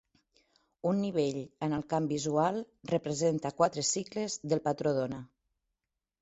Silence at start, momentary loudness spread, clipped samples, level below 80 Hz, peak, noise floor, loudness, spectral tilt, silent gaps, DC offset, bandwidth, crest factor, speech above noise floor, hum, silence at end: 0.85 s; 7 LU; under 0.1%; -68 dBFS; -12 dBFS; -88 dBFS; -32 LUFS; -5 dB/octave; none; under 0.1%; 8.4 kHz; 20 dB; 57 dB; none; 0.95 s